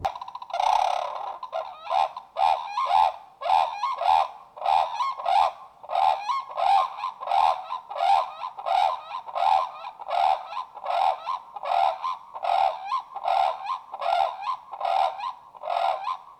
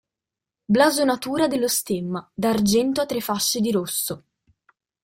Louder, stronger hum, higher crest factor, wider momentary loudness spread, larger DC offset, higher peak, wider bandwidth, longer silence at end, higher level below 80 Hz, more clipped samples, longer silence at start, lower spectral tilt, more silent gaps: second, -26 LUFS vs -22 LUFS; neither; about the same, 16 dB vs 18 dB; about the same, 11 LU vs 9 LU; neither; second, -8 dBFS vs -4 dBFS; second, 11 kHz vs 16.5 kHz; second, 0.05 s vs 0.85 s; second, -66 dBFS vs -60 dBFS; neither; second, 0 s vs 0.7 s; second, -1 dB/octave vs -4 dB/octave; neither